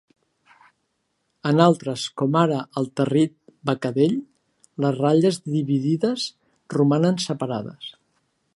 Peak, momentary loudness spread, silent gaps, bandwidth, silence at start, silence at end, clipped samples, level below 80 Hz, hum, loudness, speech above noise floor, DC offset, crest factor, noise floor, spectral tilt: -2 dBFS; 12 LU; none; 11.5 kHz; 1.45 s; 0.65 s; under 0.1%; -68 dBFS; none; -22 LUFS; 52 dB; under 0.1%; 22 dB; -73 dBFS; -6.5 dB/octave